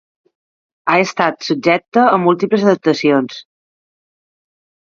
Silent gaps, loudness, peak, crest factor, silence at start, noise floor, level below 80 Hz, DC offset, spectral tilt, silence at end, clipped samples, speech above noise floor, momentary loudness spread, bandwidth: 1.88-1.92 s; -14 LUFS; 0 dBFS; 16 dB; 0.85 s; under -90 dBFS; -64 dBFS; under 0.1%; -5.5 dB/octave; 1.55 s; under 0.1%; over 76 dB; 6 LU; 7.4 kHz